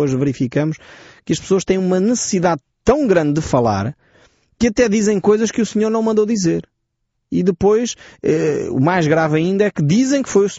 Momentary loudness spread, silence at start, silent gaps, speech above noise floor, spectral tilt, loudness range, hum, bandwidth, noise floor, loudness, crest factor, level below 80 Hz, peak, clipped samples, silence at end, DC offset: 8 LU; 0 s; none; 56 dB; -6 dB/octave; 1 LU; none; 8 kHz; -72 dBFS; -17 LUFS; 14 dB; -44 dBFS; -2 dBFS; under 0.1%; 0 s; under 0.1%